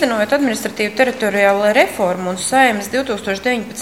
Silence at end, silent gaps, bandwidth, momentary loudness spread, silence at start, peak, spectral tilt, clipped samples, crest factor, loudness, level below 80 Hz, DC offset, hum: 0 s; none; 16.5 kHz; 7 LU; 0 s; 0 dBFS; -3.5 dB/octave; under 0.1%; 16 dB; -16 LUFS; -52 dBFS; 0.3%; none